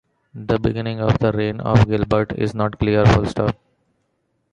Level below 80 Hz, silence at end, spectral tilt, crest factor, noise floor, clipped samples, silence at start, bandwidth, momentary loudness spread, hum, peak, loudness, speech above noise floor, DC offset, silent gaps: -36 dBFS; 1 s; -8 dB/octave; 18 dB; -69 dBFS; under 0.1%; 0.35 s; 9 kHz; 8 LU; none; -2 dBFS; -19 LUFS; 51 dB; under 0.1%; none